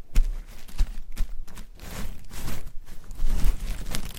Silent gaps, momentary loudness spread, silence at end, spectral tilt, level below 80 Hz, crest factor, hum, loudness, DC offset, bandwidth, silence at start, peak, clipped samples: none; 14 LU; 0 s; -4.5 dB/octave; -26 dBFS; 16 dB; none; -35 LUFS; under 0.1%; 15.5 kHz; 0 s; -6 dBFS; under 0.1%